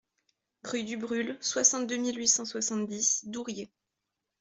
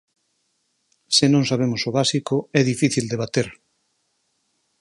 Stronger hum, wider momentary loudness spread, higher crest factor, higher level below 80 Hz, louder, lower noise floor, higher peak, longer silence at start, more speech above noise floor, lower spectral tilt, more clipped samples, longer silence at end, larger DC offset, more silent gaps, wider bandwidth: neither; first, 14 LU vs 7 LU; about the same, 22 dB vs 22 dB; second, -76 dBFS vs -60 dBFS; second, -28 LUFS vs -20 LUFS; first, -86 dBFS vs -70 dBFS; second, -10 dBFS vs 0 dBFS; second, 0.65 s vs 1.1 s; first, 55 dB vs 50 dB; second, -1.5 dB/octave vs -4.5 dB/octave; neither; second, 0.75 s vs 1.3 s; neither; neither; second, 8.2 kHz vs 11.5 kHz